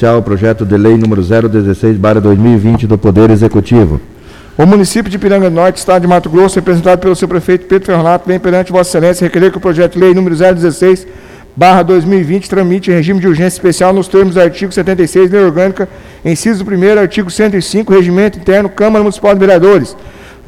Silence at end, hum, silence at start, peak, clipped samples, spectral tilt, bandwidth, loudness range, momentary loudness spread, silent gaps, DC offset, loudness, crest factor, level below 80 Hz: 0.2 s; none; 0 s; 0 dBFS; 0.5%; -6.5 dB/octave; 14.5 kHz; 1 LU; 5 LU; none; under 0.1%; -8 LUFS; 8 dB; -32 dBFS